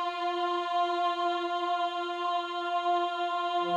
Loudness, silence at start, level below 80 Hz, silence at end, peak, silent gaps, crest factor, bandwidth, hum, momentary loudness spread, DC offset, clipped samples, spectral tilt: -30 LUFS; 0 s; -78 dBFS; 0 s; -18 dBFS; none; 12 dB; 9.8 kHz; none; 3 LU; under 0.1%; under 0.1%; -4 dB/octave